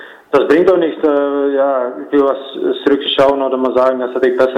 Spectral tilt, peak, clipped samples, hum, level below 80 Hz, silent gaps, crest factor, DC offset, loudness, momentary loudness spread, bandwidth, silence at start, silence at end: -6 dB/octave; -2 dBFS; under 0.1%; none; -54 dBFS; none; 10 dB; under 0.1%; -14 LUFS; 6 LU; 8.8 kHz; 0 s; 0 s